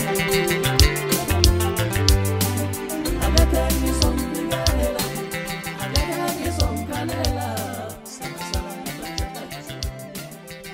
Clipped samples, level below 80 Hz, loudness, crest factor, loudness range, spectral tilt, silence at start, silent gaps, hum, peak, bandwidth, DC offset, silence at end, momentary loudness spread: under 0.1%; -28 dBFS; -22 LUFS; 22 dB; 8 LU; -4 dB/octave; 0 s; none; none; 0 dBFS; 16.5 kHz; under 0.1%; 0 s; 14 LU